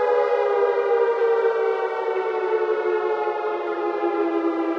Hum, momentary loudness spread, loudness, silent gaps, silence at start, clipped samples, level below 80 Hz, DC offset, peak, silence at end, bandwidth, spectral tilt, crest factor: none; 5 LU; -22 LUFS; none; 0 s; under 0.1%; under -90 dBFS; under 0.1%; -10 dBFS; 0 s; 6.4 kHz; -5 dB/octave; 12 dB